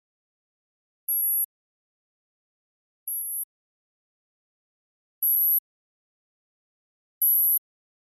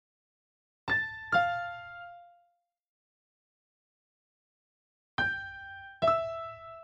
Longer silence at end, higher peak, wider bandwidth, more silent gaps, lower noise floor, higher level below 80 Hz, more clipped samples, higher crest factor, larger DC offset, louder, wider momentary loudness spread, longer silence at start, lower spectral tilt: first, 0.45 s vs 0 s; about the same, -14 dBFS vs -14 dBFS; first, 13 kHz vs 8.2 kHz; first, 1.45-3.06 s, 3.44-5.22 s, 5.59-7.21 s vs 2.88-5.18 s; first, under -90 dBFS vs -74 dBFS; second, under -90 dBFS vs -64 dBFS; neither; second, 16 dB vs 22 dB; neither; first, -22 LUFS vs -31 LUFS; second, 14 LU vs 17 LU; first, 1.1 s vs 0.85 s; second, 6.5 dB/octave vs -5 dB/octave